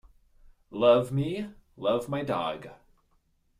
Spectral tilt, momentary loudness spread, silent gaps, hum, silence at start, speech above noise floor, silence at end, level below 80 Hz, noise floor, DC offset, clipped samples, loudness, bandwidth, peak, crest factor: -7 dB/octave; 19 LU; none; none; 0.7 s; 42 dB; 0.85 s; -60 dBFS; -69 dBFS; under 0.1%; under 0.1%; -27 LUFS; 14 kHz; -8 dBFS; 20 dB